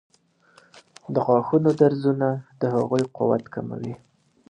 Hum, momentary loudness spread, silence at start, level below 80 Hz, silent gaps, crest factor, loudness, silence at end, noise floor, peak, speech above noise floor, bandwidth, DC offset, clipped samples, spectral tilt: none; 14 LU; 0.75 s; -66 dBFS; none; 20 dB; -23 LUFS; 0.55 s; -58 dBFS; -4 dBFS; 36 dB; 10 kHz; under 0.1%; under 0.1%; -8.5 dB/octave